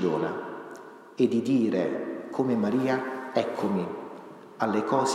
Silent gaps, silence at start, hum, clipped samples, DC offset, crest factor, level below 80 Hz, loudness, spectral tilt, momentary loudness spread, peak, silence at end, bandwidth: none; 0 s; none; under 0.1%; under 0.1%; 18 dB; -76 dBFS; -28 LUFS; -6 dB/octave; 18 LU; -10 dBFS; 0 s; 12.5 kHz